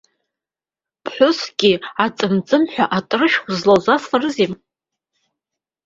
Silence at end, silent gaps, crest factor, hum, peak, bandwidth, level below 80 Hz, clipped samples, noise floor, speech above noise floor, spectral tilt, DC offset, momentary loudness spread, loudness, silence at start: 1.3 s; none; 18 dB; none; -2 dBFS; 7.8 kHz; -60 dBFS; under 0.1%; -90 dBFS; 73 dB; -5 dB/octave; under 0.1%; 6 LU; -17 LUFS; 1.05 s